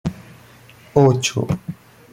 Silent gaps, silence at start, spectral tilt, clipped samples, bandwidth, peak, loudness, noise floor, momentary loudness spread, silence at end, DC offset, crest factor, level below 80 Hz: none; 0.05 s; -5.5 dB/octave; under 0.1%; 16 kHz; -2 dBFS; -19 LUFS; -46 dBFS; 19 LU; 0.4 s; under 0.1%; 18 dB; -50 dBFS